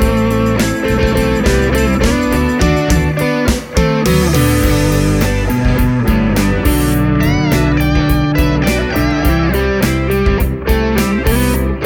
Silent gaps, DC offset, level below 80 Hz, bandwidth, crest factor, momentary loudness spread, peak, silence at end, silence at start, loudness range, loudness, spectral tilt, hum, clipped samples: none; under 0.1%; -18 dBFS; over 20 kHz; 12 dB; 2 LU; 0 dBFS; 0 s; 0 s; 1 LU; -13 LUFS; -6 dB/octave; none; under 0.1%